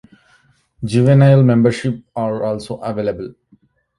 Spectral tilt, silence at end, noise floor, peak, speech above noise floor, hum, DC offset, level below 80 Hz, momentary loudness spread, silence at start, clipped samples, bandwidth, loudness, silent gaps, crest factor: -8.5 dB/octave; 0.7 s; -56 dBFS; -2 dBFS; 41 dB; none; under 0.1%; -50 dBFS; 16 LU; 0.8 s; under 0.1%; 11 kHz; -15 LUFS; none; 16 dB